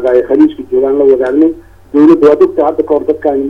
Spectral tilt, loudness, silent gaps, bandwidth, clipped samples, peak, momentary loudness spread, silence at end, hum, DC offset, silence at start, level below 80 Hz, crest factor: -8 dB/octave; -9 LUFS; none; 5.8 kHz; 0.7%; 0 dBFS; 7 LU; 0 s; none; under 0.1%; 0 s; -44 dBFS; 8 dB